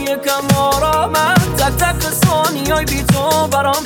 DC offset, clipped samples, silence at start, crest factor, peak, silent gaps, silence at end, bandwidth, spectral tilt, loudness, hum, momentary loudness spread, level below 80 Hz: under 0.1%; under 0.1%; 0 s; 14 dB; 0 dBFS; none; 0 s; 19 kHz; -4.5 dB/octave; -14 LUFS; none; 3 LU; -28 dBFS